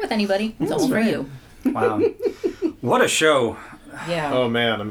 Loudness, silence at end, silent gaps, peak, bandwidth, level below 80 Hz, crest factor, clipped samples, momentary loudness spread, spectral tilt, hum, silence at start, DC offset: -21 LUFS; 0 s; none; -4 dBFS; 19 kHz; -52 dBFS; 18 dB; under 0.1%; 11 LU; -4 dB/octave; none; 0 s; under 0.1%